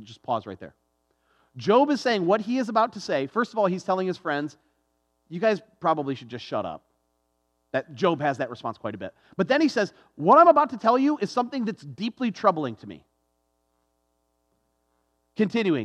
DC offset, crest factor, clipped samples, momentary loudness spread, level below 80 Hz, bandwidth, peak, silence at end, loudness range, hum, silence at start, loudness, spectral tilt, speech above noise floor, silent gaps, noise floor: under 0.1%; 22 dB; under 0.1%; 14 LU; -74 dBFS; 10 kHz; -4 dBFS; 0 s; 9 LU; none; 0 s; -24 LUFS; -6 dB/octave; 49 dB; none; -73 dBFS